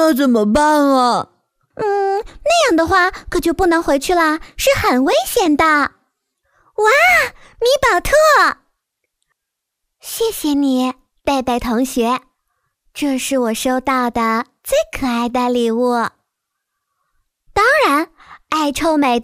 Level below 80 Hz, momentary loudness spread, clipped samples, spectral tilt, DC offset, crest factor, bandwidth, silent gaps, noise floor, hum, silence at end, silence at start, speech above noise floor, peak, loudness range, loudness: -40 dBFS; 10 LU; under 0.1%; -3.5 dB/octave; under 0.1%; 14 dB; 16 kHz; none; -79 dBFS; none; 0 s; 0 s; 64 dB; -2 dBFS; 5 LU; -15 LUFS